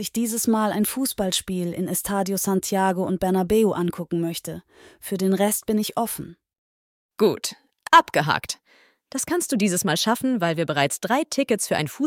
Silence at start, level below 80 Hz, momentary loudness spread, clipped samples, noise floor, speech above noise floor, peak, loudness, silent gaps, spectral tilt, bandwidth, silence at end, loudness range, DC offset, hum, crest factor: 0 s; -56 dBFS; 11 LU; under 0.1%; -59 dBFS; 36 dB; -4 dBFS; -23 LUFS; 6.58-7.09 s; -4 dB/octave; 17.5 kHz; 0 s; 4 LU; under 0.1%; none; 20 dB